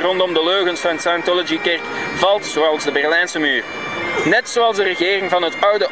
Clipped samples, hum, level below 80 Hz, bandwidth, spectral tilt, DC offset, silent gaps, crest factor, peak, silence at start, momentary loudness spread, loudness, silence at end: under 0.1%; none; -56 dBFS; 8 kHz; -3 dB/octave; 0.3%; none; 16 dB; -2 dBFS; 0 s; 4 LU; -17 LUFS; 0 s